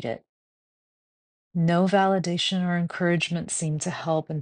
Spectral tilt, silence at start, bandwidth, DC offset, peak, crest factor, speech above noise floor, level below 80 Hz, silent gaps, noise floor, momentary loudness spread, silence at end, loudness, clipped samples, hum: -5 dB/octave; 0 s; 10 kHz; under 0.1%; -8 dBFS; 18 dB; over 66 dB; -64 dBFS; 0.29-1.51 s; under -90 dBFS; 8 LU; 0 s; -25 LUFS; under 0.1%; none